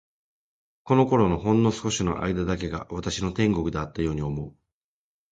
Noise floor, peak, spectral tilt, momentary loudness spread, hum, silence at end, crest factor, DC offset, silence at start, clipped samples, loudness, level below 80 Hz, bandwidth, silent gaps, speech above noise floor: under -90 dBFS; -8 dBFS; -6 dB/octave; 10 LU; none; 0.8 s; 18 dB; under 0.1%; 0.85 s; under 0.1%; -25 LUFS; -44 dBFS; 9.4 kHz; none; over 66 dB